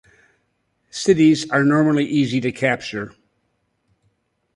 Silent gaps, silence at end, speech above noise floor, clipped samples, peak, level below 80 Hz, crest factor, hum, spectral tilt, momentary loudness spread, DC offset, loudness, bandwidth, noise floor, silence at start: none; 1.45 s; 52 dB; under 0.1%; -4 dBFS; -58 dBFS; 18 dB; none; -5.5 dB/octave; 15 LU; under 0.1%; -18 LUFS; 11.5 kHz; -69 dBFS; 0.95 s